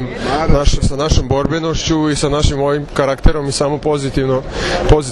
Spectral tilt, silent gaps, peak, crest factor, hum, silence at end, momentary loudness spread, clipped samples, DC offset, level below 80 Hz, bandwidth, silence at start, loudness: -5.5 dB/octave; none; 0 dBFS; 14 dB; none; 0 s; 3 LU; 0.3%; under 0.1%; -20 dBFS; 11.5 kHz; 0 s; -16 LUFS